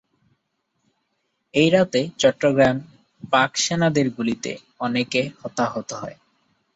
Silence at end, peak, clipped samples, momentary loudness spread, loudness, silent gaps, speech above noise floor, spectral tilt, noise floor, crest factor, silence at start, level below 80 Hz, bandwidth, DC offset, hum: 0.65 s; -4 dBFS; under 0.1%; 13 LU; -21 LUFS; none; 53 dB; -4.5 dB/octave; -74 dBFS; 20 dB; 1.55 s; -58 dBFS; 8 kHz; under 0.1%; none